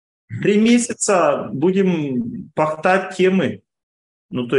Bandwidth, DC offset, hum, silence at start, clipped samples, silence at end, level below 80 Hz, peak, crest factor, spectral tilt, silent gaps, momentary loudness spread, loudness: 11.5 kHz; under 0.1%; none; 0.3 s; under 0.1%; 0 s; -62 dBFS; -2 dBFS; 16 dB; -5 dB/octave; 3.83-4.29 s; 11 LU; -18 LUFS